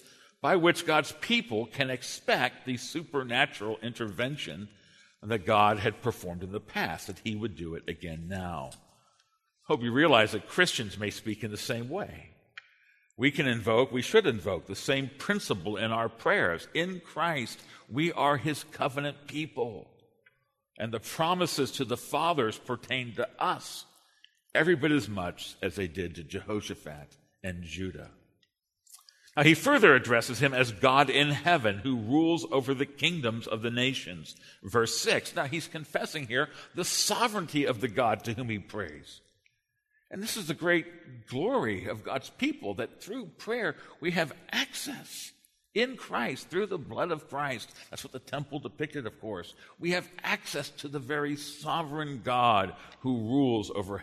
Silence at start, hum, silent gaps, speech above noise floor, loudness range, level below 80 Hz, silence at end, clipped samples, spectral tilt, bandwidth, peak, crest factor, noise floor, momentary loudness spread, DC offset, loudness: 0.45 s; none; none; 46 dB; 9 LU; -64 dBFS; 0 s; under 0.1%; -4 dB/octave; 13.5 kHz; -6 dBFS; 26 dB; -76 dBFS; 15 LU; under 0.1%; -29 LUFS